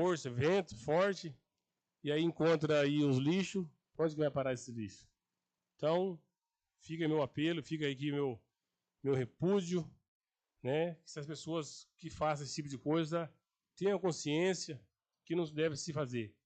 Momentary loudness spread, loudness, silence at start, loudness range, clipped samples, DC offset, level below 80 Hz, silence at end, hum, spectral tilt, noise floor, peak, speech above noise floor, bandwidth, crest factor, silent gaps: 14 LU; -36 LUFS; 0 s; 5 LU; under 0.1%; under 0.1%; -74 dBFS; 0.15 s; none; -6 dB/octave; under -90 dBFS; -20 dBFS; over 55 dB; 9 kHz; 16 dB; 10.08-10.21 s